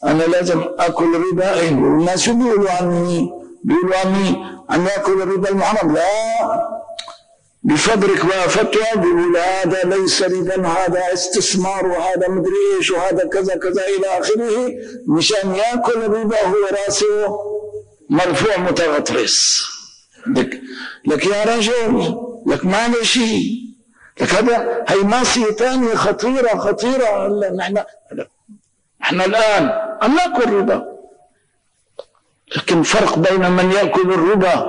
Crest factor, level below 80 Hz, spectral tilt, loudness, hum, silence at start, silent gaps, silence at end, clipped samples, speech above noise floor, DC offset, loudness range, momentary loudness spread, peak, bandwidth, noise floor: 10 dB; -48 dBFS; -4 dB/octave; -16 LUFS; none; 0 s; none; 0 s; under 0.1%; 48 dB; 0.4%; 3 LU; 9 LU; -6 dBFS; 10.5 kHz; -64 dBFS